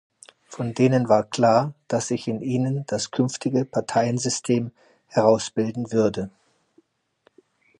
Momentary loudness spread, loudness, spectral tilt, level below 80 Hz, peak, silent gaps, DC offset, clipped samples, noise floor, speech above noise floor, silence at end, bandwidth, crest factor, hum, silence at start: 8 LU; -23 LUFS; -5.5 dB/octave; -62 dBFS; -2 dBFS; none; under 0.1%; under 0.1%; -64 dBFS; 42 dB; 1.5 s; 11 kHz; 22 dB; none; 0.5 s